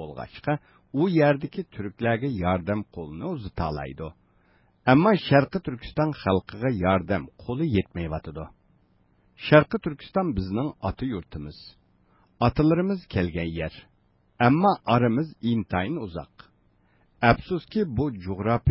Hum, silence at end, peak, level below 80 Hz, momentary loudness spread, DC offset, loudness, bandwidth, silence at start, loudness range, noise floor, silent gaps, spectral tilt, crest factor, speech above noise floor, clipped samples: none; 0 s; -2 dBFS; -44 dBFS; 16 LU; under 0.1%; -25 LUFS; 5.8 kHz; 0 s; 4 LU; -64 dBFS; none; -11.5 dB/octave; 22 dB; 40 dB; under 0.1%